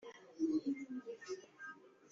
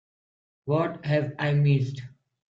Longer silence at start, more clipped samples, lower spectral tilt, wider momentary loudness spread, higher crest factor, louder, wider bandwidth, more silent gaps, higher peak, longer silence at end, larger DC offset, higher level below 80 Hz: second, 0 s vs 0.65 s; neither; second, -4 dB/octave vs -8.5 dB/octave; about the same, 16 LU vs 14 LU; about the same, 16 dB vs 16 dB; second, -43 LUFS vs -26 LUFS; about the same, 7.6 kHz vs 7 kHz; neither; second, -28 dBFS vs -12 dBFS; second, 0.05 s vs 0.45 s; neither; second, -88 dBFS vs -64 dBFS